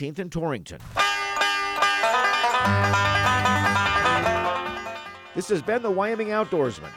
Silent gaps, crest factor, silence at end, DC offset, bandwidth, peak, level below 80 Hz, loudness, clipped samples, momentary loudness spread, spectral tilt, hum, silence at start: none; 16 dB; 0 s; under 0.1%; 16.5 kHz; -8 dBFS; -50 dBFS; -22 LUFS; under 0.1%; 11 LU; -4 dB/octave; none; 0 s